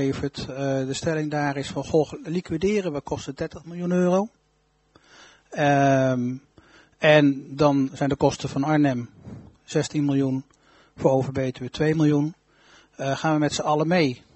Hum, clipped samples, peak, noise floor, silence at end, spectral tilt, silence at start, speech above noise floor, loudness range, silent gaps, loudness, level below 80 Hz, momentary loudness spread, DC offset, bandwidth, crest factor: none; under 0.1%; -4 dBFS; -66 dBFS; 0.2 s; -6 dB/octave; 0 s; 43 dB; 5 LU; none; -24 LUFS; -54 dBFS; 12 LU; under 0.1%; 8.2 kHz; 20 dB